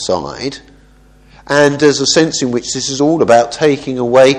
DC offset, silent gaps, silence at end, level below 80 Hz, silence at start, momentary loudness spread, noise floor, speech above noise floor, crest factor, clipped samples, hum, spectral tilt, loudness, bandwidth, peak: under 0.1%; none; 0 s; -46 dBFS; 0 s; 12 LU; -44 dBFS; 32 dB; 12 dB; 0.3%; none; -4 dB/octave; -12 LUFS; 11 kHz; 0 dBFS